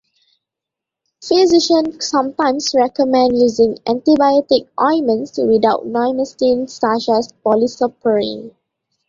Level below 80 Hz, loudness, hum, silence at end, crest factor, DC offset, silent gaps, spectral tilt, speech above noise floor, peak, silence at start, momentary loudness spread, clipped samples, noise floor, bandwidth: -56 dBFS; -15 LUFS; none; 0.6 s; 14 dB; under 0.1%; none; -4 dB/octave; 69 dB; -2 dBFS; 1.2 s; 6 LU; under 0.1%; -84 dBFS; 7.6 kHz